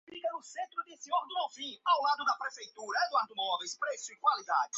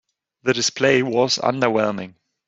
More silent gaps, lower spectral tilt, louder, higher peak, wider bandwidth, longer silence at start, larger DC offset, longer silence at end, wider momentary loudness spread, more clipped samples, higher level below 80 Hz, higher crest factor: neither; second, 3 dB/octave vs -3.5 dB/octave; second, -33 LUFS vs -19 LUFS; second, -16 dBFS vs -2 dBFS; about the same, 8 kHz vs 8 kHz; second, 0.1 s vs 0.45 s; neither; second, 0 s vs 0.35 s; about the same, 10 LU vs 10 LU; neither; second, -90 dBFS vs -62 dBFS; about the same, 18 dB vs 18 dB